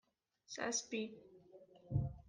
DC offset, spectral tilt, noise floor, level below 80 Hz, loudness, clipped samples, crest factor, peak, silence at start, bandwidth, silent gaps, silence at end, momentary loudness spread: under 0.1%; -4 dB/octave; -63 dBFS; -60 dBFS; -42 LUFS; under 0.1%; 20 dB; -24 dBFS; 0.5 s; 10.5 kHz; none; 0 s; 23 LU